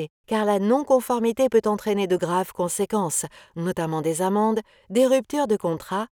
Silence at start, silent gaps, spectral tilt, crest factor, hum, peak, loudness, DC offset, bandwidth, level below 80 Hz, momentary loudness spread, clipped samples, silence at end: 0 s; 0.10-0.24 s; -5 dB/octave; 16 dB; none; -6 dBFS; -23 LUFS; under 0.1%; 19.5 kHz; -62 dBFS; 7 LU; under 0.1%; 0.05 s